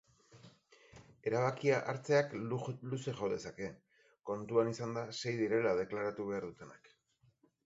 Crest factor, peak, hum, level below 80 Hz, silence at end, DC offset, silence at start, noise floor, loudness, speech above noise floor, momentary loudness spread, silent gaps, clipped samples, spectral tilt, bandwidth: 20 dB; -18 dBFS; none; -72 dBFS; 0.9 s; under 0.1%; 0.35 s; -73 dBFS; -37 LUFS; 37 dB; 13 LU; none; under 0.1%; -5.5 dB/octave; 8 kHz